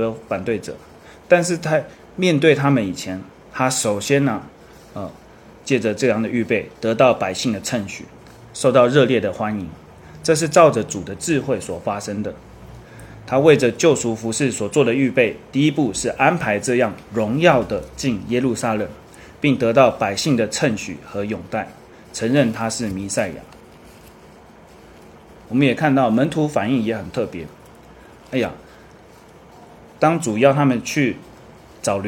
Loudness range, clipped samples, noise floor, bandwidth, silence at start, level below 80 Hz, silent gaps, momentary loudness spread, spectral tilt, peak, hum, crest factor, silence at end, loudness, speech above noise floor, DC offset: 6 LU; under 0.1%; -45 dBFS; 17 kHz; 0 s; -52 dBFS; none; 16 LU; -5 dB/octave; 0 dBFS; none; 20 dB; 0 s; -19 LUFS; 27 dB; under 0.1%